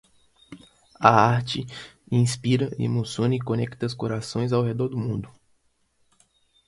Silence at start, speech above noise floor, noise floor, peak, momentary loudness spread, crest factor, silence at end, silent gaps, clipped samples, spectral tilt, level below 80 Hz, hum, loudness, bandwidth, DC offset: 0.5 s; 44 dB; -68 dBFS; 0 dBFS; 12 LU; 24 dB; 1.4 s; none; under 0.1%; -6 dB/octave; -56 dBFS; none; -24 LUFS; 11.5 kHz; under 0.1%